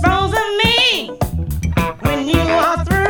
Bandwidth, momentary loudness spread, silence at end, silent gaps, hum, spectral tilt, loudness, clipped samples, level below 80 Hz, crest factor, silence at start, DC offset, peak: 20 kHz; 9 LU; 0 s; none; none; -5 dB/octave; -16 LUFS; under 0.1%; -26 dBFS; 16 dB; 0 s; under 0.1%; 0 dBFS